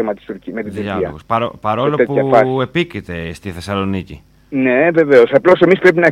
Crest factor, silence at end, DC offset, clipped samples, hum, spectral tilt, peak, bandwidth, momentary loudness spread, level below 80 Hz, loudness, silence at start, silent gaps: 14 dB; 0 s; under 0.1%; under 0.1%; none; -7 dB/octave; 0 dBFS; 12 kHz; 15 LU; -46 dBFS; -14 LUFS; 0 s; none